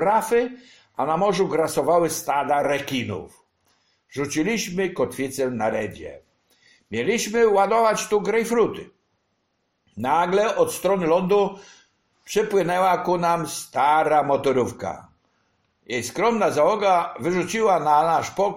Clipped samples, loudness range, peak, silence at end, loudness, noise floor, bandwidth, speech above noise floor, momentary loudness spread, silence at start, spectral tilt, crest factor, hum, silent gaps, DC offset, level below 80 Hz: under 0.1%; 4 LU; -6 dBFS; 0 s; -22 LUFS; -72 dBFS; 16.5 kHz; 51 dB; 11 LU; 0 s; -4.5 dB/octave; 16 dB; none; none; under 0.1%; -56 dBFS